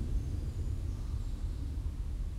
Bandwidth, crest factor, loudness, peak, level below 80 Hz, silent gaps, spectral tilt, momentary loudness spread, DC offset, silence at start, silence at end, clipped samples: 12.5 kHz; 12 dB; -39 LUFS; -24 dBFS; -36 dBFS; none; -7.5 dB/octave; 3 LU; under 0.1%; 0 s; 0 s; under 0.1%